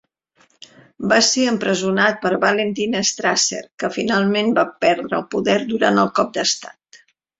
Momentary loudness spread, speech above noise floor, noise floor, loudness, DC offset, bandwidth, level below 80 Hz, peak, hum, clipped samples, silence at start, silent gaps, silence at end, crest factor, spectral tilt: 7 LU; 41 dB; -59 dBFS; -18 LUFS; under 0.1%; 8 kHz; -60 dBFS; -2 dBFS; none; under 0.1%; 1 s; 3.74-3.78 s; 0.45 s; 18 dB; -3 dB/octave